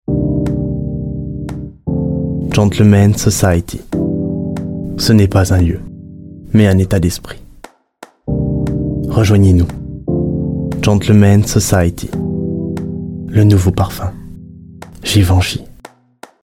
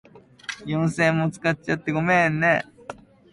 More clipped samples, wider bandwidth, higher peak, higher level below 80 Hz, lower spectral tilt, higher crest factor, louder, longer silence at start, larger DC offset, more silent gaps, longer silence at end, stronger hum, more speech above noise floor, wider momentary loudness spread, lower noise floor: neither; first, 16 kHz vs 11.5 kHz; first, 0 dBFS vs -6 dBFS; first, -32 dBFS vs -56 dBFS; about the same, -6.5 dB/octave vs -6.5 dB/octave; about the same, 14 dB vs 16 dB; first, -14 LUFS vs -22 LUFS; second, 0.1 s vs 0.5 s; neither; neither; first, 0.75 s vs 0.4 s; neither; first, 31 dB vs 20 dB; second, 15 LU vs 18 LU; about the same, -41 dBFS vs -42 dBFS